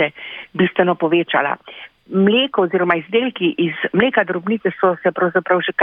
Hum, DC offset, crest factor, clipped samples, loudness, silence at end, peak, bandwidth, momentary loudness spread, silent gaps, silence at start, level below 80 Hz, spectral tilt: none; under 0.1%; 16 dB; under 0.1%; -17 LUFS; 0 s; -2 dBFS; 3.8 kHz; 8 LU; none; 0 s; -62 dBFS; -9 dB/octave